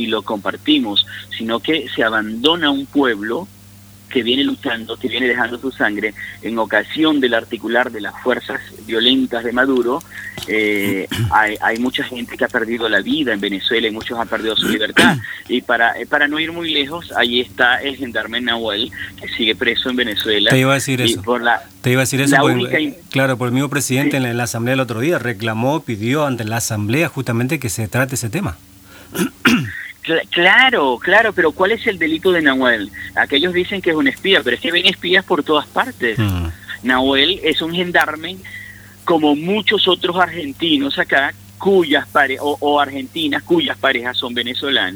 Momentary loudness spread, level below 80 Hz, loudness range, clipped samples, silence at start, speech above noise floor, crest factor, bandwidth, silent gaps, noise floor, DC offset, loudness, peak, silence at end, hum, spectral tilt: 9 LU; -48 dBFS; 4 LU; under 0.1%; 0 s; 25 dB; 18 dB; over 20 kHz; none; -42 dBFS; under 0.1%; -16 LUFS; 0 dBFS; 0 s; none; -4 dB/octave